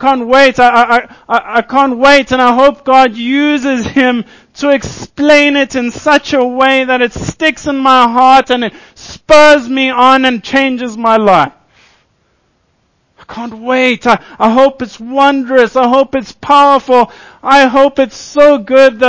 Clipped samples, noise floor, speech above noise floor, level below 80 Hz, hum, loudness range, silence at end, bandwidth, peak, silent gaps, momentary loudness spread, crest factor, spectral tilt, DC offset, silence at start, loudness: 4%; -57 dBFS; 49 dB; -42 dBFS; none; 6 LU; 0 s; 8 kHz; 0 dBFS; none; 9 LU; 10 dB; -4 dB/octave; under 0.1%; 0 s; -9 LUFS